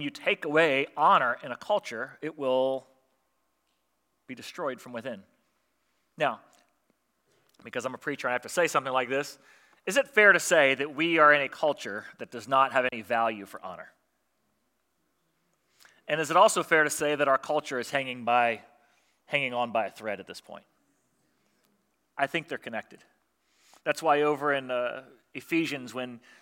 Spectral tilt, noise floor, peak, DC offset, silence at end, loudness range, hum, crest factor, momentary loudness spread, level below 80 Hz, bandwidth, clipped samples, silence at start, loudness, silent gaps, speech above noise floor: -3 dB/octave; -77 dBFS; -6 dBFS; under 0.1%; 0.25 s; 14 LU; none; 24 dB; 19 LU; -82 dBFS; 16.5 kHz; under 0.1%; 0 s; -26 LUFS; none; 49 dB